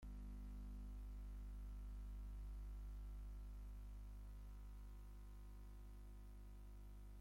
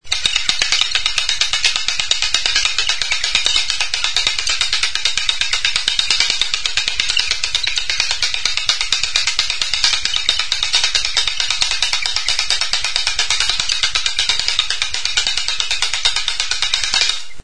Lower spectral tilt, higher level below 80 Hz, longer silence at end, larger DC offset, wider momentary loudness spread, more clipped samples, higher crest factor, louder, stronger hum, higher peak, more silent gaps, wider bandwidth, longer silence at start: first, -7 dB/octave vs 2 dB/octave; second, -54 dBFS vs -38 dBFS; about the same, 0 s vs 0 s; second, under 0.1% vs 6%; first, 6 LU vs 3 LU; neither; second, 8 dB vs 18 dB; second, -58 LUFS vs -15 LUFS; first, 50 Hz at -55 dBFS vs none; second, -46 dBFS vs 0 dBFS; neither; first, 16 kHz vs 11 kHz; about the same, 0 s vs 0 s